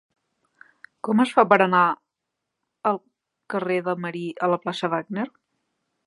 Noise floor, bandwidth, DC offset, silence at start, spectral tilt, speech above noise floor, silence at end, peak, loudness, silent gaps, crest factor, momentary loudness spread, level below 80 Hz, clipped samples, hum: -82 dBFS; 11.5 kHz; under 0.1%; 1.05 s; -6.5 dB/octave; 61 dB; 0.8 s; 0 dBFS; -23 LUFS; none; 24 dB; 14 LU; -78 dBFS; under 0.1%; none